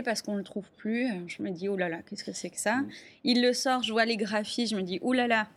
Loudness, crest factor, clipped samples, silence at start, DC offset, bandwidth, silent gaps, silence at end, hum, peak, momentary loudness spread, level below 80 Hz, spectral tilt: -29 LUFS; 18 dB; under 0.1%; 0 s; under 0.1%; 15 kHz; none; 0.05 s; none; -12 dBFS; 11 LU; -74 dBFS; -3.5 dB/octave